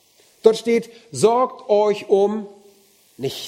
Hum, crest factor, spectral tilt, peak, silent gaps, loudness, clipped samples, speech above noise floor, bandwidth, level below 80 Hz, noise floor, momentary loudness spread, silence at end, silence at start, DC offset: none; 20 dB; -5 dB/octave; 0 dBFS; none; -19 LUFS; under 0.1%; 36 dB; 15.5 kHz; -66 dBFS; -54 dBFS; 13 LU; 0 s; 0.45 s; under 0.1%